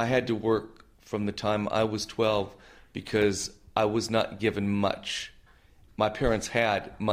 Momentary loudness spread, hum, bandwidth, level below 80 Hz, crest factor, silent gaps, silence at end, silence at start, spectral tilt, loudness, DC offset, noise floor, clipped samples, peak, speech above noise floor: 10 LU; none; 15.5 kHz; -48 dBFS; 20 dB; none; 0 s; 0 s; -5 dB/octave; -28 LUFS; under 0.1%; -57 dBFS; under 0.1%; -8 dBFS; 29 dB